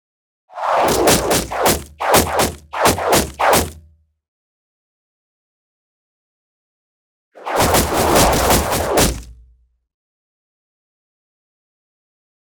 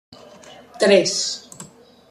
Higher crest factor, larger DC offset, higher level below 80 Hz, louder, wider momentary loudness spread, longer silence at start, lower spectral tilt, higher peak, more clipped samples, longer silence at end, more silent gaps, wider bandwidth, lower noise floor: about the same, 18 dB vs 20 dB; neither; first, -34 dBFS vs -66 dBFS; first, -15 LUFS vs -18 LUFS; second, 7 LU vs 25 LU; about the same, 0.55 s vs 0.5 s; about the same, -3 dB/octave vs -3 dB/octave; about the same, -2 dBFS vs -2 dBFS; neither; first, 3.15 s vs 0.45 s; first, 4.28-7.32 s vs none; first, 19.5 kHz vs 13 kHz; first, -54 dBFS vs -44 dBFS